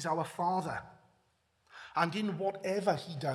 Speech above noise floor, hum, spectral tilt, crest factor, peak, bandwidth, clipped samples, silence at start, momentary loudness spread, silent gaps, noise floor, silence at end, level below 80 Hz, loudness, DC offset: 41 dB; none; -5.5 dB/octave; 22 dB; -14 dBFS; 14.5 kHz; under 0.1%; 0 s; 8 LU; none; -74 dBFS; 0 s; -74 dBFS; -34 LUFS; under 0.1%